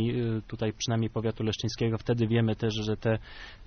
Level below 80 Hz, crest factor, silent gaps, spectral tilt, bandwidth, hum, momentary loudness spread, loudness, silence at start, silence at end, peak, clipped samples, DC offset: -50 dBFS; 16 dB; none; -6 dB/octave; 6.6 kHz; none; 6 LU; -30 LUFS; 0 s; 0 s; -14 dBFS; under 0.1%; under 0.1%